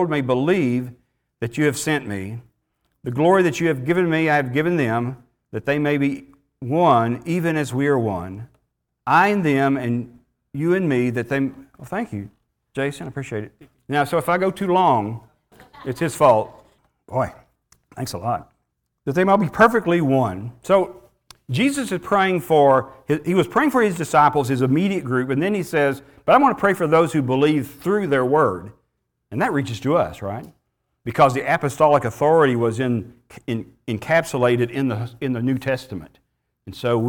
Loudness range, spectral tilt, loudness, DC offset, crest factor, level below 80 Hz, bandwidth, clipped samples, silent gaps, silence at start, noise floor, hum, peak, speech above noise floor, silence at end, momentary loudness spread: 5 LU; -6.5 dB/octave; -20 LUFS; under 0.1%; 18 dB; -56 dBFS; 19.5 kHz; under 0.1%; none; 0 s; -74 dBFS; none; -2 dBFS; 54 dB; 0 s; 15 LU